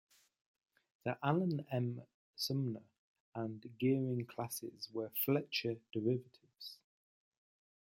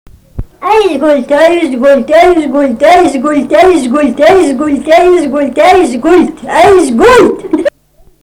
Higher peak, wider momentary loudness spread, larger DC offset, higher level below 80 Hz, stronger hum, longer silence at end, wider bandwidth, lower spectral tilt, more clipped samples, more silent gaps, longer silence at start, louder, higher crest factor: second, -18 dBFS vs 0 dBFS; first, 15 LU vs 7 LU; neither; second, -82 dBFS vs -34 dBFS; neither; first, 1.1 s vs 0.55 s; about the same, 16.5 kHz vs 17 kHz; first, -6 dB/octave vs -4.5 dB/octave; second, under 0.1% vs 2%; first, 2.14-2.34 s, 2.99-3.32 s vs none; first, 1.05 s vs 0.35 s; second, -39 LUFS vs -7 LUFS; first, 22 dB vs 6 dB